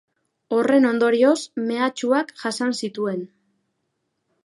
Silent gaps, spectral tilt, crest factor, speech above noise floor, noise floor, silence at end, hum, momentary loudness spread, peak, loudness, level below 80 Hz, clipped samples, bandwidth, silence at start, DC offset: none; -4.5 dB/octave; 16 dB; 54 dB; -75 dBFS; 1.2 s; none; 10 LU; -6 dBFS; -21 LUFS; -74 dBFS; under 0.1%; 11.5 kHz; 0.5 s; under 0.1%